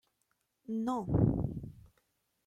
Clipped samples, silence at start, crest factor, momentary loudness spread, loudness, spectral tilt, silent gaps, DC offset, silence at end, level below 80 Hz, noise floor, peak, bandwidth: under 0.1%; 0.7 s; 20 dB; 19 LU; -33 LUFS; -10 dB/octave; none; under 0.1%; 0.65 s; -50 dBFS; -80 dBFS; -14 dBFS; 11.5 kHz